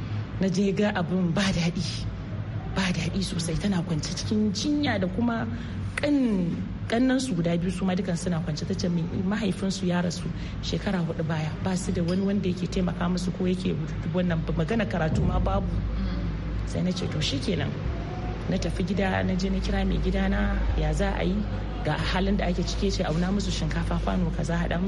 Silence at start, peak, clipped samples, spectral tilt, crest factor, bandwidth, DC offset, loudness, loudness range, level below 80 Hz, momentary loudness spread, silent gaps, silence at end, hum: 0 s; -12 dBFS; under 0.1%; -6 dB/octave; 14 dB; 11.5 kHz; under 0.1%; -27 LUFS; 2 LU; -34 dBFS; 6 LU; none; 0 s; none